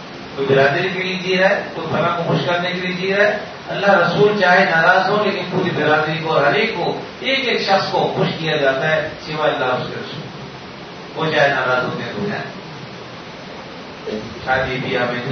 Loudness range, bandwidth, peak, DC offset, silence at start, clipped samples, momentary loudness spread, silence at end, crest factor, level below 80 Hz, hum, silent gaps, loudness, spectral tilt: 6 LU; 6.6 kHz; 0 dBFS; under 0.1%; 0 s; under 0.1%; 19 LU; 0 s; 18 dB; -52 dBFS; none; none; -17 LUFS; -5.5 dB/octave